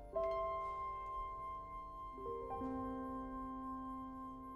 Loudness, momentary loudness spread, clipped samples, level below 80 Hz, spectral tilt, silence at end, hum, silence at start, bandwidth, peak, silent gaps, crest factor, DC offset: -45 LUFS; 9 LU; under 0.1%; -58 dBFS; -8 dB/octave; 0 s; none; 0 s; 12.5 kHz; -28 dBFS; none; 16 dB; under 0.1%